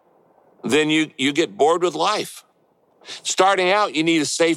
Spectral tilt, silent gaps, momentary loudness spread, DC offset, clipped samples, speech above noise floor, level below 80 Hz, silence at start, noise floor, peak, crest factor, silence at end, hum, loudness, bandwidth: -3 dB/octave; none; 11 LU; under 0.1%; under 0.1%; 42 dB; -72 dBFS; 0.65 s; -61 dBFS; -4 dBFS; 16 dB; 0 s; none; -19 LUFS; 14 kHz